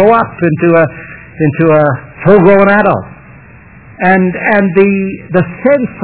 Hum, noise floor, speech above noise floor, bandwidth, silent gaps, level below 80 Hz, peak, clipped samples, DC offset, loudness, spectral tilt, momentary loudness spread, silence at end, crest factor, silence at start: none; -36 dBFS; 27 dB; 4 kHz; none; -42 dBFS; 0 dBFS; 1%; under 0.1%; -10 LUFS; -11.5 dB/octave; 9 LU; 0 s; 10 dB; 0 s